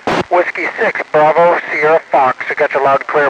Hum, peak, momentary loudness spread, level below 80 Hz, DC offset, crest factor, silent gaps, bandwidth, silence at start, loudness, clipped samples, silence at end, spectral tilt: none; -2 dBFS; 5 LU; -54 dBFS; under 0.1%; 12 dB; none; 9.8 kHz; 0.05 s; -13 LUFS; under 0.1%; 0 s; -5.5 dB/octave